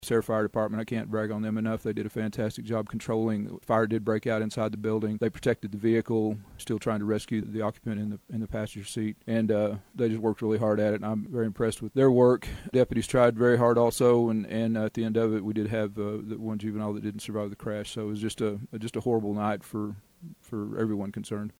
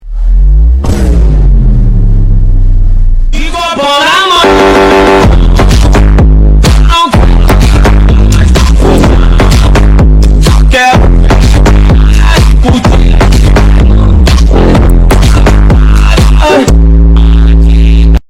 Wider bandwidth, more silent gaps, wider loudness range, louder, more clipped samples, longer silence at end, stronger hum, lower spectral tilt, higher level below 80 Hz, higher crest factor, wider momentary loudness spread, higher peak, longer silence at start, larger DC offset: first, 16 kHz vs 12.5 kHz; neither; first, 8 LU vs 3 LU; second, -28 LUFS vs -6 LUFS; second, under 0.1% vs 2%; about the same, 0.1 s vs 0.1 s; neither; about the same, -7 dB/octave vs -6 dB/octave; second, -56 dBFS vs -4 dBFS; first, 18 dB vs 2 dB; first, 12 LU vs 5 LU; second, -10 dBFS vs 0 dBFS; about the same, 0 s vs 0.05 s; neither